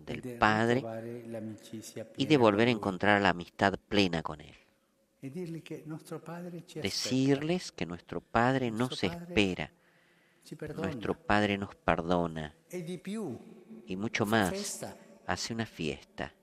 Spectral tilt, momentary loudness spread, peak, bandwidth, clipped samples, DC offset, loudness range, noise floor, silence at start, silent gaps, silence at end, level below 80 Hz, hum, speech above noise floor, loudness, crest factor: -5 dB/octave; 16 LU; -8 dBFS; 15 kHz; under 0.1%; under 0.1%; 6 LU; -72 dBFS; 0 s; none; 0.15 s; -58 dBFS; none; 40 dB; -31 LUFS; 24 dB